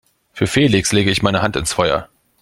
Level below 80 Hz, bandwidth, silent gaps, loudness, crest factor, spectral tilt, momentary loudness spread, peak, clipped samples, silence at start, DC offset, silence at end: -40 dBFS; 16 kHz; none; -16 LUFS; 18 dB; -4.5 dB/octave; 5 LU; 0 dBFS; under 0.1%; 0.35 s; under 0.1%; 0.35 s